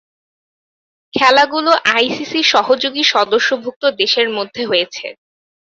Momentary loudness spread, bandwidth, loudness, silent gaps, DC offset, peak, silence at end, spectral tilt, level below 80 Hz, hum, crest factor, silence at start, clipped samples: 9 LU; 8 kHz; -14 LUFS; 3.76-3.81 s; under 0.1%; 0 dBFS; 0.55 s; -2 dB/octave; -62 dBFS; none; 16 dB; 1.15 s; under 0.1%